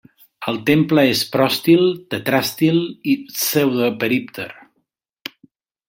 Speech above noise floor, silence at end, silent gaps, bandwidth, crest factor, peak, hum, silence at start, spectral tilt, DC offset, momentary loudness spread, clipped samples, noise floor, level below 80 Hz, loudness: 53 dB; 1.35 s; none; 16.5 kHz; 16 dB; -2 dBFS; none; 0.4 s; -5 dB/octave; under 0.1%; 17 LU; under 0.1%; -71 dBFS; -60 dBFS; -17 LUFS